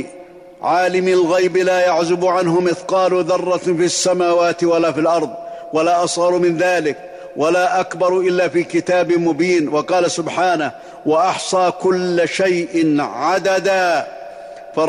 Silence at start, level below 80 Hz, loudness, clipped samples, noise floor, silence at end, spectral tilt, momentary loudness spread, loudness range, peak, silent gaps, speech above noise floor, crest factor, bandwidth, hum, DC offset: 0 s; -60 dBFS; -16 LUFS; under 0.1%; -38 dBFS; 0 s; -4.5 dB/octave; 7 LU; 1 LU; -6 dBFS; none; 23 dB; 10 dB; 11 kHz; none; under 0.1%